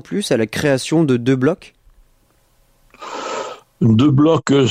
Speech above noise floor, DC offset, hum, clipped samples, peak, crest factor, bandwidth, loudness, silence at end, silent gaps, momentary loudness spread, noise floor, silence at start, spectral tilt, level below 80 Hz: 42 dB; under 0.1%; none; under 0.1%; -4 dBFS; 14 dB; 15 kHz; -16 LUFS; 0 s; none; 16 LU; -57 dBFS; 0.1 s; -6.5 dB/octave; -50 dBFS